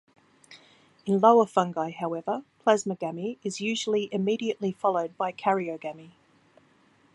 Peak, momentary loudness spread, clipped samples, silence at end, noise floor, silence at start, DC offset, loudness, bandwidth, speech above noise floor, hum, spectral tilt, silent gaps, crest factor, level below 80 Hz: -6 dBFS; 12 LU; under 0.1%; 1.05 s; -62 dBFS; 0.5 s; under 0.1%; -27 LUFS; 11.5 kHz; 36 dB; none; -5 dB/octave; none; 22 dB; -76 dBFS